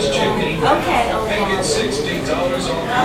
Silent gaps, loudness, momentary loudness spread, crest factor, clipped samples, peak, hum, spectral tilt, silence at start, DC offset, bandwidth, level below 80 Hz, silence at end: none; -18 LUFS; 4 LU; 16 dB; under 0.1%; 0 dBFS; none; -4 dB/octave; 0 s; under 0.1%; 16 kHz; -36 dBFS; 0 s